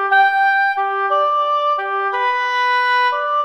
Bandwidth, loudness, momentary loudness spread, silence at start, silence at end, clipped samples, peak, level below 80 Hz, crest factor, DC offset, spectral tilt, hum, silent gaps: 12.5 kHz; -16 LUFS; 5 LU; 0 s; 0 s; under 0.1%; -4 dBFS; -74 dBFS; 12 dB; under 0.1%; 0 dB/octave; none; none